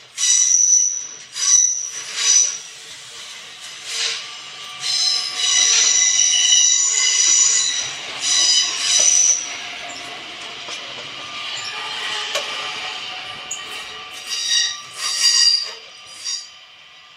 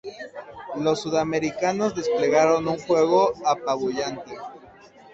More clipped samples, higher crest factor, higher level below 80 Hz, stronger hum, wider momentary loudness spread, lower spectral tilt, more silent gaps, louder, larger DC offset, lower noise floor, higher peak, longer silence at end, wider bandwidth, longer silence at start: neither; about the same, 18 dB vs 16 dB; second, -68 dBFS vs -60 dBFS; neither; about the same, 19 LU vs 19 LU; second, 3.5 dB/octave vs -5 dB/octave; neither; first, -15 LUFS vs -23 LUFS; neither; second, -44 dBFS vs -49 dBFS; first, -2 dBFS vs -6 dBFS; second, 0.15 s vs 0.45 s; first, 16 kHz vs 8 kHz; about the same, 0 s vs 0.05 s